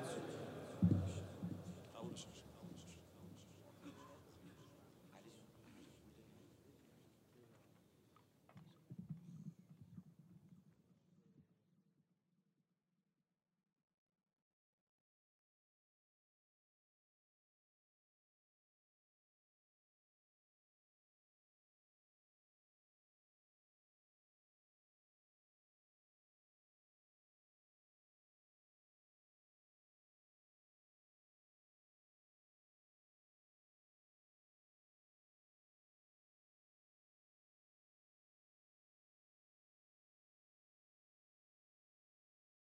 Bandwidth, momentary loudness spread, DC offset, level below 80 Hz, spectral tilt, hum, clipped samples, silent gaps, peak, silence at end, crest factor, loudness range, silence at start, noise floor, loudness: 16 kHz; 21 LU; under 0.1%; -84 dBFS; -7 dB/octave; none; under 0.1%; none; -24 dBFS; 31.2 s; 32 dB; 21 LU; 0 s; under -90 dBFS; -47 LUFS